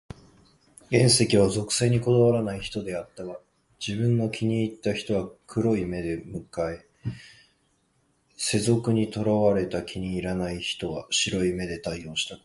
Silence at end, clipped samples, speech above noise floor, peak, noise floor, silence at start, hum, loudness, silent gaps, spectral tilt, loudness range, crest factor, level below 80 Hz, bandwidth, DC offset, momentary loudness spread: 0.1 s; under 0.1%; 43 dB; -6 dBFS; -69 dBFS; 0.9 s; none; -25 LUFS; none; -5 dB/octave; 7 LU; 20 dB; -50 dBFS; 11.5 kHz; under 0.1%; 14 LU